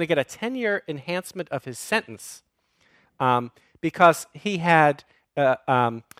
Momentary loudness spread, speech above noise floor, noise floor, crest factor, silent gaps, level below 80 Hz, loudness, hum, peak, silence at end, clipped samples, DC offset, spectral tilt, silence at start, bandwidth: 16 LU; 41 dB; -64 dBFS; 22 dB; none; -68 dBFS; -23 LUFS; none; -2 dBFS; 0.2 s; under 0.1%; under 0.1%; -5 dB/octave; 0 s; 16 kHz